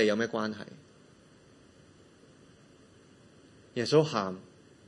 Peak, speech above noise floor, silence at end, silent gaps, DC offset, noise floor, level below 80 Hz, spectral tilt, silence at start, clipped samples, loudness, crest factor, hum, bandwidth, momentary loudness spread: -12 dBFS; 29 dB; 0.45 s; none; under 0.1%; -58 dBFS; -76 dBFS; -5.5 dB/octave; 0 s; under 0.1%; -30 LUFS; 22 dB; none; 11 kHz; 21 LU